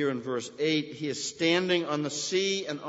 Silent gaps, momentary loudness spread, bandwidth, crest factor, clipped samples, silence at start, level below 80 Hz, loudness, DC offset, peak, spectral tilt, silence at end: none; 7 LU; 8 kHz; 16 dB; under 0.1%; 0 s; -74 dBFS; -28 LUFS; under 0.1%; -12 dBFS; -3.5 dB/octave; 0 s